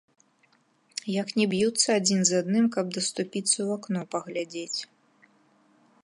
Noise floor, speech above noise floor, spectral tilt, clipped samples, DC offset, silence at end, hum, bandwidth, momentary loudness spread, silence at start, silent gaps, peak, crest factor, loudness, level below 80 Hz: -66 dBFS; 39 dB; -3.5 dB/octave; under 0.1%; under 0.1%; 1.2 s; none; 11.5 kHz; 11 LU; 1.05 s; none; -8 dBFS; 20 dB; -26 LUFS; -74 dBFS